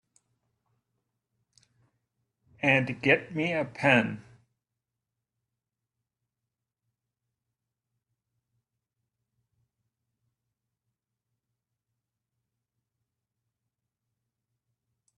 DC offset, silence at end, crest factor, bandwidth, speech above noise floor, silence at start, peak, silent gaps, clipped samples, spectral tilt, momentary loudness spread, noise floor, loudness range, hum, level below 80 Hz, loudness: under 0.1%; 10.95 s; 28 dB; 11.5 kHz; 62 dB; 2.65 s; -8 dBFS; none; under 0.1%; -6 dB/octave; 8 LU; -88 dBFS; 4 LU; none; -74 dBFS; -26 LUFS